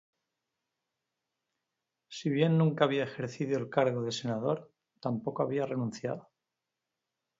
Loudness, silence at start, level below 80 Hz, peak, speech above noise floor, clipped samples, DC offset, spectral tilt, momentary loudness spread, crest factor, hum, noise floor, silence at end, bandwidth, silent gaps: -32 LUFS; 2.1 s; -76 dBFS; -10 dBFS; 57 dB; under 0.1%; under 0.1%; -6.5 dB/octave; 11 LU; 24 dB; none; -88 dBFS; 1.2 s; 7.8 kHz; none